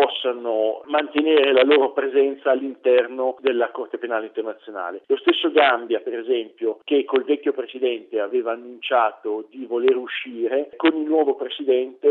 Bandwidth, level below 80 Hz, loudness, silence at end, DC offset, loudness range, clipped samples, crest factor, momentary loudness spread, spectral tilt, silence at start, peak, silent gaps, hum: 4.3 kHz; -76 dBFS; -21 LUFS; 0 s; under 0.1%; 4 LU; under 0.1%; 20 dB; 12 LU; -6 dB/octave; 0 s; -2 dBFS; none; none